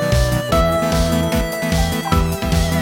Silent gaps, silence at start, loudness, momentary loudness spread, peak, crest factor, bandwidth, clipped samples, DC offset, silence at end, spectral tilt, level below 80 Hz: none; 0 s; -18 LUFS; 3 LU; -2 dBFS; 14 dB; 17 kHz; under 0.1%; under 0.1%; 0 s; -5.5 dB/octave; -24 dBFS